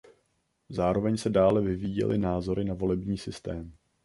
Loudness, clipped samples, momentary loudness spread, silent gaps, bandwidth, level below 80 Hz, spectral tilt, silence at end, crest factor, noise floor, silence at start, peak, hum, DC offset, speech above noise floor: -28 LUFS; under 0.1%; 14 LU; none; 11.5 kHz; -48 dBFS; -7.5 dB/octave; 0.35 s; 18 dB; -74 dBFS; 0.7 s; -10 dBFS; none; under 0.1%; 47 dB